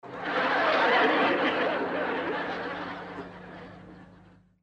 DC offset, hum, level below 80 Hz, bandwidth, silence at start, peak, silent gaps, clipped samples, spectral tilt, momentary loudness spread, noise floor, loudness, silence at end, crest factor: under 0.1%; 50 Hz at -55 dBFS; -64 dBFS; 9.4 kHz; 0.05 s; -12 dBFS; none; under 0.1%; -5 dB/octave; 21 LU; -56 dBFS; -26 LUFS; 0.45 s; 16 dB